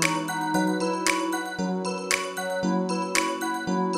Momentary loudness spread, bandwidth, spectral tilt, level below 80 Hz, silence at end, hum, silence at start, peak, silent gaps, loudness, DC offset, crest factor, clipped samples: 4 LU; 16 kHz; -4 dB/octave; -64 dBFS; 0 s; none; 0 s; -6 dBFS; none; -26 LUFS; under 0.1%; 22 dB; under 0.1%